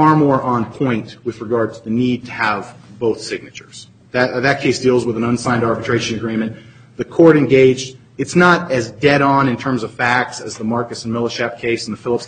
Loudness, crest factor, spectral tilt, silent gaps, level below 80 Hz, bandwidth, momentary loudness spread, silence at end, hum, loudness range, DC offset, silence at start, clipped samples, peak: -16 LUFS; 16 dB; -6 dB/octave; none; -50 dBFS; 9.4 kHz; 13 LU; 0 s; none; 6 LU; under 0.1%; 0 s; under 0.1%; 0 dBFS